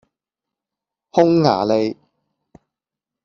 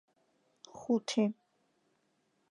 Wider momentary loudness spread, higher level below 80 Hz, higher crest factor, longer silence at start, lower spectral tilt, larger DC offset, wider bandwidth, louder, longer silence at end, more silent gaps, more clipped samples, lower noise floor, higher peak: second, 8 LU vs 22 LU; first, -60 dBFS vs -84 dBFS; about the same, 20 dB vs 20 dB; first, 1.15 s vs 0.75 s; first, -7 dB/octave vs -5 dB/octave; neither; second, 7 kHz vs 11 kHz; first, -17 LUFS vs -33 LUFS; about the same, 1.3 s vs 1.2 s; neither; neither; first, -86 dBFS vs -76 dBFS; first, -2 dBFS vs -18 dBFS